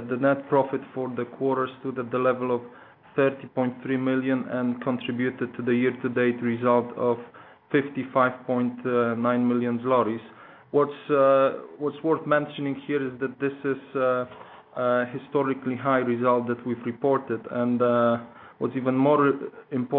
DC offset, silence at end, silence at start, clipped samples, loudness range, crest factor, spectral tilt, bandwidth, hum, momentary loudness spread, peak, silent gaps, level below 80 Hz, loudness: under 0.1%; 0 s; 0 s; under 0.1%; 3 LU; 18 dB; -11 dB/octave; 4.1 kHz; none; 9 LU; -8 dBFS; none; -74 dBFS; -25 LUFS